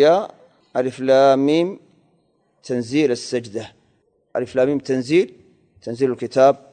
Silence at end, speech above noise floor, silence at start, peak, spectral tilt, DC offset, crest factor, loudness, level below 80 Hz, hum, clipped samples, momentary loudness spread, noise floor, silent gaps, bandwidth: 0.15 s; 45 dB; 0 s; -2 dBFS; -6 dB/octave; under 0.1%; 18 dB; -19 LUFS; -64 dBFS; none; under 0.1%; 17 LU; -63 dBFS; none; 9.4 kHz